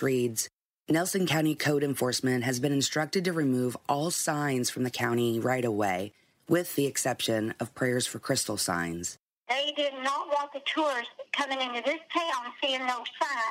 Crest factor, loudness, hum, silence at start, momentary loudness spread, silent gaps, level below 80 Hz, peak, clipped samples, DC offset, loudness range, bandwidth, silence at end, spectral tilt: 18 dB; -29 LUFS; none; 0 s; 5 LU; 0.53-0.84 s, 9.19-9.43 s; -70 dBFS; -12 dBFS; under 0.1%; under 0.1%; 2 LU; 16 kHz; 0 s; -4 dB/octave